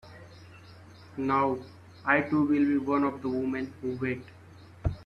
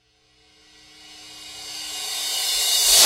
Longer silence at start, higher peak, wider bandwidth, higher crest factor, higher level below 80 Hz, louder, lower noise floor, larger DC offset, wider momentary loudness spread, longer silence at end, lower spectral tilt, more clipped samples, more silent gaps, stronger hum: second, 0.05 s vs 1.05 s; second, -12 dBFS vs -2 dBFS; second, 6.6 kHz vs 16 kHz; about the same, 18 dB vs 22 dB; first, -50 dBFS vs -56 dBFS; second, -29 LUFS vs -20 LUFS; second, -50 dBFS vs -59 dBFS; neither; second, 15 LU vs 24 LU; about the same, 0 s vs 0 s; first, -8.5 dB/octave vs 3 dB/octave; neither; neither; neither